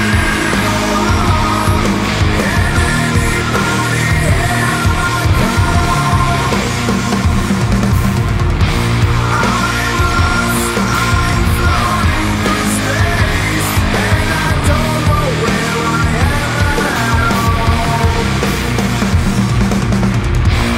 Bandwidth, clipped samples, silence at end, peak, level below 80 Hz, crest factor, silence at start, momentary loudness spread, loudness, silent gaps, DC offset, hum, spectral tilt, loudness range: 16.5 kHz; under 0.1%; 0 s; 0 dBFS; -20 dBFS; 12 dB; 0 s; 1 LU; -13 LUFS; none; under 0.1%; none; -5 dB/octave; 1 LU